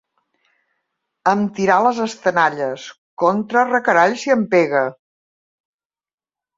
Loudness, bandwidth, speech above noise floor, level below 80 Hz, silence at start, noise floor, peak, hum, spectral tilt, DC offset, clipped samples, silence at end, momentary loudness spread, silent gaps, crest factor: -17 LUFS; 7.8 kHz; over 73 dB; -66 dBFS; 1.25 s; under -90 dBFS; -2 dBFS; none; -5.5 dB/octave; under 0.1%; under 0.1%; 1.65 s; 10 LU; 2.98-3.17 s; 18 dB